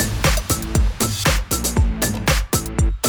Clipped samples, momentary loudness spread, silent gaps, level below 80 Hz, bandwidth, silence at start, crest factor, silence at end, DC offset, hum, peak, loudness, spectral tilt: under 0.1%; 3 LU; none; -22 dBFS; over 20 kHz; 0 s; 16 dB; 0 s; under 0.1%; none; -4 dBFS; -20 LUFS; -4 dB/octave